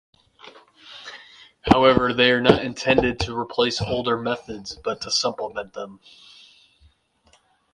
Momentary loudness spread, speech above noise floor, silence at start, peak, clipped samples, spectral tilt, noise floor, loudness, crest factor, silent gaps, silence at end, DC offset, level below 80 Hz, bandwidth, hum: 22 LU; 39 dB; 0.45 s; -2 dBFS; under 0.1%; -4.5 dB/octave; -61 dBFS; -21 LUFS; 22 dB; none; 1.8 s; under 0.1%; -44 dBFS; 11 kHz; none